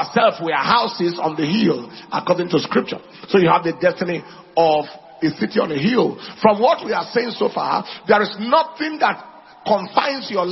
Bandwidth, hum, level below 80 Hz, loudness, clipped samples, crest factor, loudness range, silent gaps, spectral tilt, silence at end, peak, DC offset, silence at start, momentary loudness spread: 6 kHz; none; -62 dBFS; -19 LUFS; under 0.1%; 18 dB; 1 LU; none; -6.5 dB/octave; 0 s; -2 dBFS; under 0.1%; 0 s; 8 LU